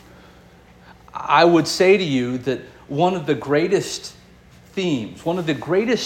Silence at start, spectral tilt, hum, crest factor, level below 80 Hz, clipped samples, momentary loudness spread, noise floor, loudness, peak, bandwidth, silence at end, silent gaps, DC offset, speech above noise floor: 0.9 s; -5 dB/octave; none; 18 dB; -54 dBFS; under 0.1%; 15 LU; -48 dBFS; -19 LUFS; -2 dBFS; 17 kHz; 0 s; none; under 0.1%; 29 dB